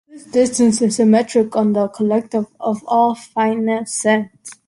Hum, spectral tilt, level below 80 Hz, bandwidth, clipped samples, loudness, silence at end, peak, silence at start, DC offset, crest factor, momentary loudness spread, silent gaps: none; -5 dB/octave; -60 dBFS; 11.5 kHz; under 0.1%; -17 LUFS; 0.15 s; -2 dBFS; 0.15 s; under 0.1%; 14 dB; 7 LU; none